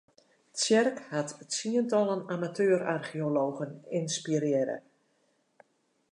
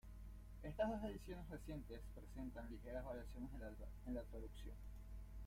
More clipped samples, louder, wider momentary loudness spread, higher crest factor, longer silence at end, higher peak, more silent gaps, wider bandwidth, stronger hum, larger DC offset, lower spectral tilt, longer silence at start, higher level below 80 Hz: neither; first, -30 LUFS vs -52 LUFS; second, 9 LU vs 13 LU; about the same, 18 dB vs 20 dB; first, 1.35 s vs 0 s; first, -14 dBFS vs -30 dBFS; neither; second, 11 kHz vs 16 kHz; neither; neither; second, -4.5 dB/octave vs -7 dB/octave; first, 0.55 s vs 0.05 s; second, -82 dBFS vs -56 dBFS